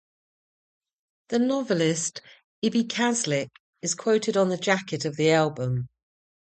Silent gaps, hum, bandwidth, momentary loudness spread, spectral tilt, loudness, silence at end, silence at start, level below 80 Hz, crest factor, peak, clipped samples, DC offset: 2.44-2.62 s, 3.60-3.73 s; none; 9.2 kHz; 9 LU; -4.5 dB/octave; -25 LUFS; 0.7 s; 1.3 s; -66 dBFS; 18 dB; -8 dBFS; under 0.1%; under 0.1%